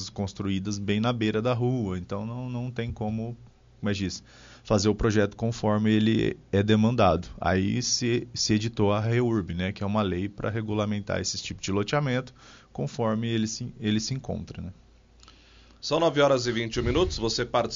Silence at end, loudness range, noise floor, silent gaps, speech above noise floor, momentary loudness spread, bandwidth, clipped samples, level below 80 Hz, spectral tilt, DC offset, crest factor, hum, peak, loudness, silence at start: 0 s; 6 LU; -54 dBFS; none; 28 dB; 11 LU; 7.4 kHz; under 0.1%; -46 dBFS; -5.5 dB/octave; under 0.1%; 18 dB; none; -8 dBFS; -27 LUFS; 0 s